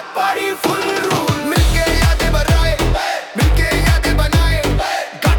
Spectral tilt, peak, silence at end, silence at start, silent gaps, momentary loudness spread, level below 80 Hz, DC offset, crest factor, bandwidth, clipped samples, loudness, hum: -4.5 dB/octave; -2 dBFS; 0 s; 0 s; none; 4 LU; -18 dBFS; under 0.1%; 12 dB; 19 kHz; under 0.1%; -16 LUFS; none